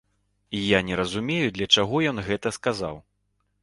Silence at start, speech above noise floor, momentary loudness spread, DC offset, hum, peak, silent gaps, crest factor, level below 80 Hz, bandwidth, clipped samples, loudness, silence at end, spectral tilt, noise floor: 0.5 s; 48 dB; 13 LU; under 0.1%; none; -4 dBFS; none; 22 dB; -52 dBFS; 11.5 kHz; under 0.1%; -24 LUFS; 0.65 s; -4 dB/octave; -72 dBFS